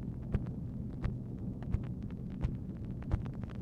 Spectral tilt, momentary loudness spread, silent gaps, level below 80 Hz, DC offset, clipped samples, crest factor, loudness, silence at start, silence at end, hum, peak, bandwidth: -10 dB/octave; 4 LU; none; -44 dBFS; under 0.1%; under 0.1%; 20 dB; -40 LUFS; 0 s; 0 s; none; -18 dBFS; 6.4 kHz